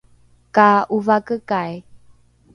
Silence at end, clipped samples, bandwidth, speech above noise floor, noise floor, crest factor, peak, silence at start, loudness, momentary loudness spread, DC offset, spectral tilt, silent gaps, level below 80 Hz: 0.6 s; under 0.1%; 10 kHz; 36 dB; -53 dBFS; 20 dB; 0 dBFS; 0.55 s; -17 LUFS; 13 LU; under 0.1%; -7 dB/octave; none; -58 dBFS